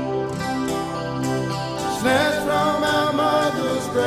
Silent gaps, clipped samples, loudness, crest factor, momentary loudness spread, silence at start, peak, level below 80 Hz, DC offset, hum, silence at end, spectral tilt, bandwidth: none; under 0.1%; -21 LUFS; 16 dB; 6 LU; 0 s; -6 dBFS; -50 dBFS; under 0.1%; none; 0 s; -4.5 dB/octave; 15.5 kHz